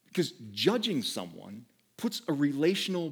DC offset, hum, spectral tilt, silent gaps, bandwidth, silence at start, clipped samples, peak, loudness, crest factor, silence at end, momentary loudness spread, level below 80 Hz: under 0.1%; none; -4.5 dB/octave; none; over 20 kHz; 0.15 s; under 0.1%; -10 dBFS; -30 LUFS; 20 dB; 0 s; 17 LU; -84 dBFS